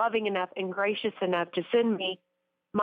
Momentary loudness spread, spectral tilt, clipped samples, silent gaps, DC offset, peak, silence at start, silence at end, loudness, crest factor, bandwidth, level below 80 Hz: 7 LU; -8 dB/octave; under 0.1%; none; under 0.1%; -16 dBFS; 0 s; 0 s; -29 LUFS; 14 dB; 4.9 kHz; -78 dBFS